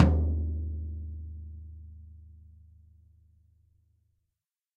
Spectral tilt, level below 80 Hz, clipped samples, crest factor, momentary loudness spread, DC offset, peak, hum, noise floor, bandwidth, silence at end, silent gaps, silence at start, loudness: -9 dB/octave; -36 dBFS; under 0.1%; 26 dB; 25 LU; under 0.1%; -6 dBFS; none; -87 dBFS; 4.5 kHz; 2.35 s; none; 0 s; -33 LUFS